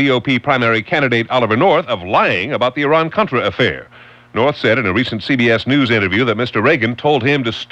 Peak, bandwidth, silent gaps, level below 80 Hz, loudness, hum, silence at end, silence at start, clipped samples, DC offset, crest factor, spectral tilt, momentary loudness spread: -2 dBFS; 8.4 kHz; none; -50 dBFS; -15 LUFS; none; 0.05 s; 0 s; under 0.1%; under 0.1%; 12 dB; -6.5 dB/octave; 4 LU